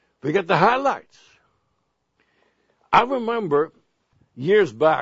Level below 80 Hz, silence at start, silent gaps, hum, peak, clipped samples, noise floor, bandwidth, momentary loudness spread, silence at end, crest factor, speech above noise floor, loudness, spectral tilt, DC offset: -60 dBFS; 0.25 s; none; none; 0 dBFS; under 0.1%; -72 dBFS; 7.8 kHz; 9 LU; 0 s; 22 dB; 53 dB; -20 LUFS; -6 dB/octave; under 0.1%